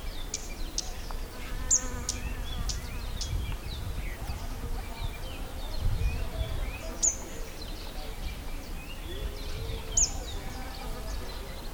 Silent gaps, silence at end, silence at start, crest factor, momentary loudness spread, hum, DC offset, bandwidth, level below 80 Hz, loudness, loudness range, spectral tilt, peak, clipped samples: none; 0 s; 0 s; 22 dB; 15 LU; none; under 0.1%; over 20 kHz; -36 dBFS; -34 LUFS; 4 LU; -2.5 dB/octave; -12 dBFS; under 0.1%